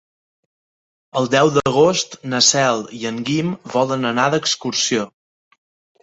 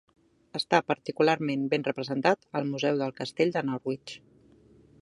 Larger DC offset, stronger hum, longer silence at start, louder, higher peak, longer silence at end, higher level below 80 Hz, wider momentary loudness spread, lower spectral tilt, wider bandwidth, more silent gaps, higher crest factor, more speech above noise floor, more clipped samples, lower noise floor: neither; neither; first, 1.15 s vs 0.55 s; first, -17 LUFS vs -28 LUFS; first, -2 dBFS vs -6 dBFS; about the same, 0.95 s vs 0.85 s; first, -56 dBFS vs -72 dBFS; about the same, 9 LU vs 10 LU; second, -3.5 dB/octave vs -5.5 dB/octave; second, 8.2 kHz vs 11.5 kHz; neither; about the same, 18 dB vs 22 dB; first, over 72 dB vs 30 dB; neither; first, under -90 dBFS vs -58 dBFS